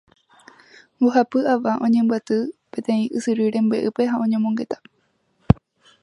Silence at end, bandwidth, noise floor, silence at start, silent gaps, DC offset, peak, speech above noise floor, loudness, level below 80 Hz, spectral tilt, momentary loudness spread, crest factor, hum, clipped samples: 0.5 s; 11 kHz; -67 dBFS; 1 s; none; under 0.1%; 0 dBFS; 47 dB; -21 LUFS; -42 dBFS; -7.5 dB/octave; 7 LU; 22 dB; none; under 0.1%